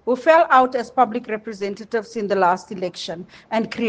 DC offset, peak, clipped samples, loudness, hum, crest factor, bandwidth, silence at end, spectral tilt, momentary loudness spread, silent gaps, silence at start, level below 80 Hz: under 0.1%; 0 dBFS; under 0.1%; -20 LUFS; none; 20 dB; 9.2 kHz; 0 s; -5 dB/octave; 14 LU; none; 0.05 s; -64 dBFS